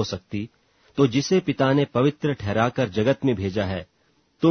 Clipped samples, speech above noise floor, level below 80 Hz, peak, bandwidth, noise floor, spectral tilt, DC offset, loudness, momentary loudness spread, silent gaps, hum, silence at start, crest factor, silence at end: under 0.1%; 42 dB; -54 dBFS; -6 dBFS; 6.6 kHz; -64 dBFS; -6.5 dB/octave; under 0.1%; -23 LUFS; 12 LU; none; none; 0 s; 18 dB; 0 s